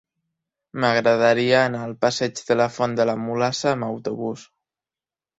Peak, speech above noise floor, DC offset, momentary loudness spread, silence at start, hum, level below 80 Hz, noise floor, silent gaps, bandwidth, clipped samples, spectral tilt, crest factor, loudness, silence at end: -4 dBFS; over 69 dB; under 0.1%; 11 LU; 0.75 s; none; -64 dBFS; under -90 dBFS; none; 8 kHz; under 0.1%; -5 dB/octave; 20 dB; -21 LUFS; 0.95 s